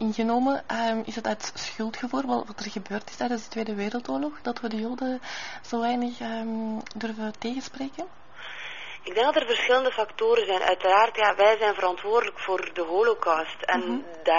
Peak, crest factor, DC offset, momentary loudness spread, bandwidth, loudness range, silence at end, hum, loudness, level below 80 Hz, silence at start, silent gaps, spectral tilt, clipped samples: -6 dBFS; 20 dB; 0.6%; 14 LU; 7.2 kHz; 9 LU; 0 s; none; -26 LUFS; -64 dBFS; 0 s; none; -1.5 dB/octave; under 0.1%